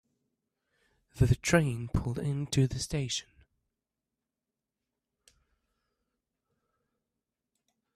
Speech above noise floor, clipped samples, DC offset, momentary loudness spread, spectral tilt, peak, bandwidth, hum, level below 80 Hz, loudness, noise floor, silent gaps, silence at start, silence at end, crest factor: 60 dB; under 0.1%; under 0.1%; 8 LU; -5.5 dB/octave; -10 dBFS; 14 kHz; none; -50 dBFS; -30 LUFS; -89 dBFS; none; 1.15 s; 4.75 s; 26 dB